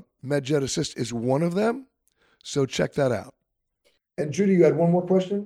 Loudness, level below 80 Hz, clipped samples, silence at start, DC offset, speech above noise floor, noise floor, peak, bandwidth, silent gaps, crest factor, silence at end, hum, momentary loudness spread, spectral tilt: -24 LUFS; -60 dBFS; under 0.1%; 0.25 s; under 0.1%; 53 dB; -76 dBFS; -6 dBFS; 12.5 kHz; none; 18 dB; 0 s; none; 12 LU; -6 dB/octave